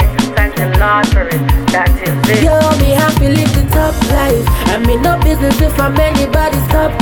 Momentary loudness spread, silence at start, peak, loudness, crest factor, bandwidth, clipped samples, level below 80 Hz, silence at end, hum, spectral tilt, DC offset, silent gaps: 3 LU; 0 s; 0 dBFS; -12 LUFS; 10 dB; over 20 kHz; under 0.1%; -16 dBFS; 0 s; none; -6 dB/octave; under 0.1%; none